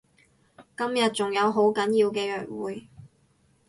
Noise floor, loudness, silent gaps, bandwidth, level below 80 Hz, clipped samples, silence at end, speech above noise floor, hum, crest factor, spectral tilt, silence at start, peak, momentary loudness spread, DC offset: -64 dBFS; -25 LUFS; none; 11.5 kHz; -68 dBFS; under 0.1%; 0.65 s; 40 dB; none; 16 dB; -4.5 dB/octave; 0.6 s; -12 dBFS; 13 LU; under 0.1%